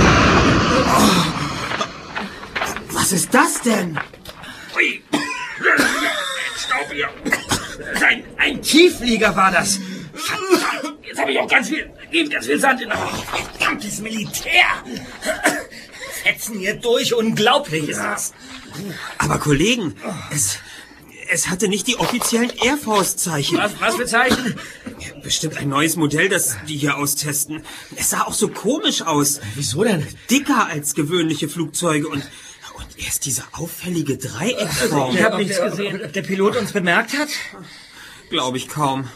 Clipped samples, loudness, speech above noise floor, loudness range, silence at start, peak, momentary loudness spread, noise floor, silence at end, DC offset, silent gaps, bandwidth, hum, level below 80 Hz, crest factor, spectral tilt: under 0.1%; -18 LUFS; 20 dB; 4 LU; 0 s; 0 dBFS; 14 LU; -40 dBFS; 0 s; under 0.1%; none; 15.5 kHz; none; -42 dBFS; 20 dB; -3 dB/octave